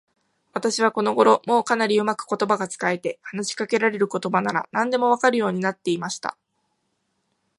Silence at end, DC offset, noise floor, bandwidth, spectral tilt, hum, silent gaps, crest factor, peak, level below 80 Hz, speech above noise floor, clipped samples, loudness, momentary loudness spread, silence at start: 1.25 s; under 0.1%; -73 dBFS; 11.5 kHz; -4 dB/octave; none; none; 20 dB; -2 dBFS; -74 dBFS; 51 dB; under 0.1%; -22 LUFS; 10 LU; 0.55 s